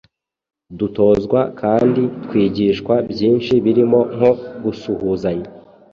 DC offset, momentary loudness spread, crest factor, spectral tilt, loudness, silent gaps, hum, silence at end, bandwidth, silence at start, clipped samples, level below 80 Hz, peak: under 0.1%; 10 LU; 16 dB; -8.5 dB/octave; -17 LUFS; none; none; 0.35 s; 7 kHz; 0.7 s; under 0.1%; -48 dBFS; -2 dBFS